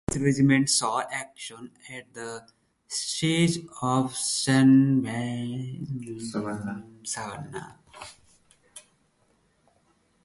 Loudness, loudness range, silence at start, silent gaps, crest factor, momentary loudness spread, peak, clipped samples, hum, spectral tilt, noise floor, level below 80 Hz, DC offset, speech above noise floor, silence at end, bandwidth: -25 LUFS; 14 LU; 0.1 s; none; 20 dB; 21 LU; -8 dBFS; under 0.1%; none; -4.5 dB/octave; -67 dBFS; -58 dBFS; under 0.1%; 41 dB; 1.45 s; 11.5 kHz